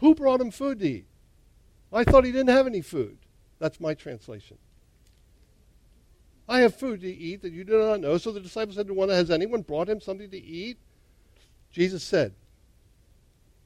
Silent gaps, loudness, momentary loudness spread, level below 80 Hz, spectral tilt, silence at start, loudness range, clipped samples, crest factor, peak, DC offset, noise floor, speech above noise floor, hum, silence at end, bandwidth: none; -25 LUFS; 17 LU; -46 dBFS; -6.5 dB/octave; 0 s; 8 LU; under 0.1%; 20 dB; -6 dBFS; under 0.1%; -60 dBFS; 35 dB; none; 1.35 s; 13.5 kHz